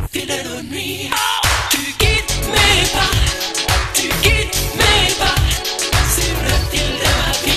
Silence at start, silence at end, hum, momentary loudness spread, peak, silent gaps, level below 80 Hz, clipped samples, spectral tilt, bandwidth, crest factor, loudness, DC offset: 0 s; 0 s; none; 9 LU; 0 dBFS; none; -24 dBFS; under 0.1%; -2.5 dB/octave; 14 kHz; 16 dB; -15 LUFS; under 0.1%